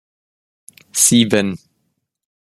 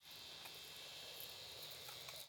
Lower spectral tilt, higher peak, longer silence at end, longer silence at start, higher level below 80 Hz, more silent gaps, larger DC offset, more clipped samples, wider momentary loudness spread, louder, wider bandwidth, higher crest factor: first, -3 dB/octave vs -0.5 dB/octave; first, 0 dBFS vs -32 dBFS; first, 0.95 s vs 0 s; first, 0.95 s vs 0 s; first, -58 dBFS vs -82 dBFS; neither; neither; neither; first, 14 LU vs 2 LU; first, -14 LUFS vs -51 LUFS; second, 14.5 kHz vs 19.5 kHz; about the same, 20 dB vs 22 dB